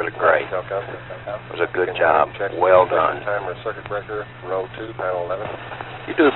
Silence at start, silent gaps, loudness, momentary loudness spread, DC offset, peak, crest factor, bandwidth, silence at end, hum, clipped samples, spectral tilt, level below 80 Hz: 0 s; none; -21 LUFS; 16 LU; under 0.1%; -2 dBFS; 18 dB; 4.2 kHz; 0 s; none; under 0.1%; -10.5 dB/octave; -52 dBFS